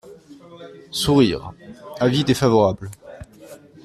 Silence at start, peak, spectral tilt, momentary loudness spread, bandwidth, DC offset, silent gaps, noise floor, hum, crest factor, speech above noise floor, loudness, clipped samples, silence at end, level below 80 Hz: 0.05 s; -4 dBFS; -6 dB/octave; 25 LU; 14.5 kHz; under 0.1%; none; -44 dBFS; none; 18 dB; 26 dB; -19 LUFS; under 0.1%; 0.3 s; -48 dBFS